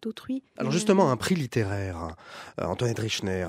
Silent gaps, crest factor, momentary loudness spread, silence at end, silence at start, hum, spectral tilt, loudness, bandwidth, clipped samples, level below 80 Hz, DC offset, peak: none; 20 dB; 15 LU; 0 s; 0 s; none; -5.5 dB/octave; -27 LUFS; 16 kHz; under 0.1%; -54 dBFS; under 0.1%; -8 dBFS